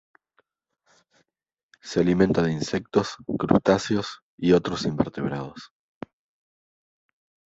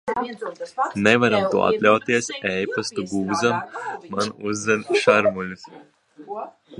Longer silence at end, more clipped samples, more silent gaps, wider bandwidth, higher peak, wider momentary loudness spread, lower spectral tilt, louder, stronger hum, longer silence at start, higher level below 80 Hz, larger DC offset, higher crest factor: first, 1.9 s vs 0 s; neither; first, 4.22-4.38 s vs none; second, 8 kHz vs 11.5 kHz; about the same, -2 dBFS vs 0 dBFS; first, 23 LU vs 15 LU; first, -6.5 dB/octave vs -4.5 dB/octave; second, -24 LUFS vs -21 LUFS; neither; first, 1.85 s vs 0.05 s; first, -52 dBFS vs -60 dBFS; neither; about the same, 24 dB vs 22 dB